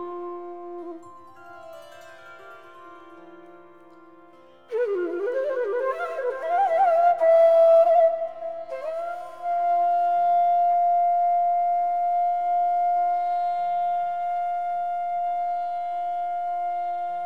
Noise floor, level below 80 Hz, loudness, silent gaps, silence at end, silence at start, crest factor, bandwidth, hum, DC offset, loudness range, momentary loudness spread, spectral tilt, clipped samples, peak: -52 dBFS; -82 dBFS; -23 LUFS; none; 0 s; 0 s; 14 dB; 4.9 kHz; none; 0.4%; 13 LU; 16 LU; -5 dB/octave; under 0.1%; -10 dBFS